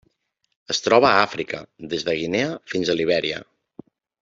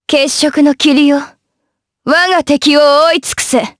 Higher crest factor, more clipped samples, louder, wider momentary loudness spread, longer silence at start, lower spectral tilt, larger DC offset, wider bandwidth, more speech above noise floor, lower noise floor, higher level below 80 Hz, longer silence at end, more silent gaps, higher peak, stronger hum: first, 22 dB vs 10 dB; neither; second, -21 LUFS vs -10 LUFS; first, 14 LU vs 6 LU; first, 0.7 s vs 0.1 s; first, -4 dB/octave vs -2 dB/octave; neither; second, 7.8 kHz vs 11 kHz; second, 50 dB vs 61 dB; about the same, -71 dBFS vs -71 dBFS; second, -60 dBFS vs -50 dBFS; first, 0.8 s vs 0.1 s; neither; about the same, -2 dBFS vs 0 dBFS; neither